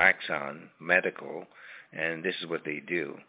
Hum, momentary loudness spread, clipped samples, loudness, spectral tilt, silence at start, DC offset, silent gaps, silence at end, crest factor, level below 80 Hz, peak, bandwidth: none; 17 LU; under 0.1%; -29 LUFS; -2 dB/octave; 0 s; under 0.1%; none; 0.05 s; 24 dB; -70 dBFS; -6 dBFS; 4 kHz